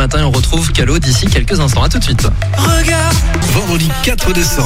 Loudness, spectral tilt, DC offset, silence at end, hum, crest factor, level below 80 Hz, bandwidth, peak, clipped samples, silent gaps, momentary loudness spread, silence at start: -12 LUFS; -4.5 dB/octave; under 0.1%; 0 s; none; 10 dB; -16 dBFS; 16.5 kHz; 0 dBFS; under 0.1%; none; 2 LU; 0 s